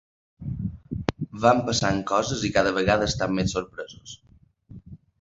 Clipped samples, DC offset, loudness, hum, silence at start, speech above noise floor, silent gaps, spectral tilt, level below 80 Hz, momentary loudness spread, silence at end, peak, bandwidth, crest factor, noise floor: under 0.1%; under 0.1%; -24 LUFS; none; 0.4 s; 26 dB; none; -4.5 dB/octave; -44 dBFS; 21 LU; 0.25 s; -2 dBFS; 8 kHz; 24 dB; -50 dBFS